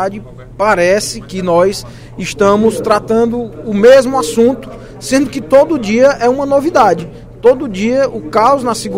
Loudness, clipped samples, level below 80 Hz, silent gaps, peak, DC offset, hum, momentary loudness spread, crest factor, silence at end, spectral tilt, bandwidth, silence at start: -12 LUFS; 0.4%; -38 dBFS; none; 0 dBFS; under 0.1%; none; 12 LU; 12 dB; 0 s; -5 dB/octave; 16 kHz; 0 s